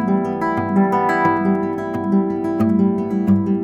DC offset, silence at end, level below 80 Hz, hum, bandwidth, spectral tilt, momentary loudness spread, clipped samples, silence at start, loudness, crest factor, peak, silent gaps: under 0.1%; 0 s; -54 dBFS; none; 8 kHz; -9.5 dB/octave; 4 LU; under 0.1%; 0 s; -18 LUFS; 12 dB; -4 dBFS; none